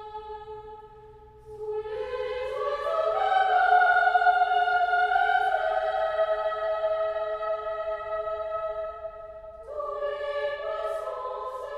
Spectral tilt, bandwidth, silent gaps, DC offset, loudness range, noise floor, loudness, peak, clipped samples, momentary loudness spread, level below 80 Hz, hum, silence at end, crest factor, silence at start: -3 dB/octave; 9 kHz; none; under 0.1%; 10 LU; -49 dBFS; -26 LUFS; -10 dBFS; under 0.1%; 19 LU; -58 dBFS; none; 0 s; 18 dB; 0 s